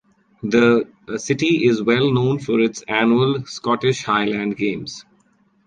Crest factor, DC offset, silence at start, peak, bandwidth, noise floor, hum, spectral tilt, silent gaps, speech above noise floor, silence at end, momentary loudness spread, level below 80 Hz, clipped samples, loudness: 18 dB; under 0.1%; 0.45 s; -2 dBFS; 9.2 kHz; -60 dBFS; none; -5.5 dB/octave; none; 41 dB; 0.65 s; 12 LU; -58 dBFS; under 0.1%; -19 LUFS